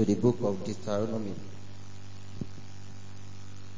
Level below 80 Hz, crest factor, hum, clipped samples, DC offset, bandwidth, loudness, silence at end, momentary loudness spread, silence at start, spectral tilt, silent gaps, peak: -58 dBFS; 22 dB; none; under 0.1%; 2%; 7.6 kHz; -32 LUFS; 0 s; 20 LU; 0 s; -7.5 dB/octave; none; -12 dBFS